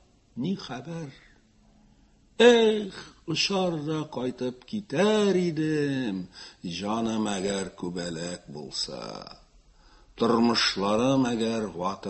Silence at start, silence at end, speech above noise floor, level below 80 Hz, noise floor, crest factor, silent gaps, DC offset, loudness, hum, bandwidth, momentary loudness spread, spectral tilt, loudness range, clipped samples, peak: 0.35 s; 0 s; 33 dB; -58 dBFS; -60 dBFS; 22 dB; none; under 0.1%; -26 LUFS; none; 8.6 kHz; 17 LU; -4.5 dB/octave; 6 LU; under 0.1%; -4 dBFS